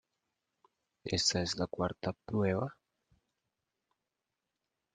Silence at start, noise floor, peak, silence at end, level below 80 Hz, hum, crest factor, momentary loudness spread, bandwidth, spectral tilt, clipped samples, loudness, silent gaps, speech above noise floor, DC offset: 1.05 s; -88 dBFS; -16 dBFS; 2.2 s; -66 dBFS; none; 22 dB; 10 LU; 9.6 kHz; -4 dB/octave; under 0.1%; -34 LUFS; none; 54 dB; under 0.1%